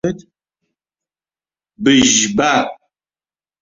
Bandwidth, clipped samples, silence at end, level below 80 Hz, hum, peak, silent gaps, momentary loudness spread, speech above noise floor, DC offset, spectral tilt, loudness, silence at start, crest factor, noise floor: 7.8 kHz; under 0.1%; 0.9 s; -50 dBFS; none; 0 dBFS; none; 15 LU; over 76 dB; under 0.1%; -2.5 dB/octave; -13 LUFS; 0.05 s; 18 dB; under -90 dBFS